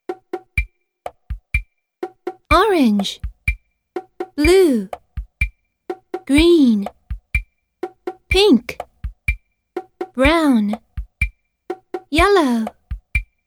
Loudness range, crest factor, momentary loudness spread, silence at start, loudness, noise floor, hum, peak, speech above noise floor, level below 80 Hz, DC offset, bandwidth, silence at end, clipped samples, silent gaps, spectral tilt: 4 LU; 18 dB; 20 LU; 0.1 s; -17 LUFS; -37 dBFS; none; 0 dBFS; 23 dB; -30 dBFS; under 0.1%; 17 kHz; 0.25 s; under 0.1%; none; -5.5 dB/octave